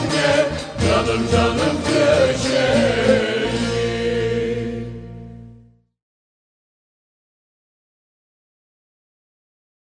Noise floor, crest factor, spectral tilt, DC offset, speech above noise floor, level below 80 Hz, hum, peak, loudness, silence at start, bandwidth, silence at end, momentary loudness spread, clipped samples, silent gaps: -49 dBFS; 18 dB; -5 dB/octave; under 0.1%; 33 dB; -40 dBFS; none; -4 dBFS; -18 LUFS; 0 s; 10 kHz; 4.35 s; 13 LU; under 0.1%; none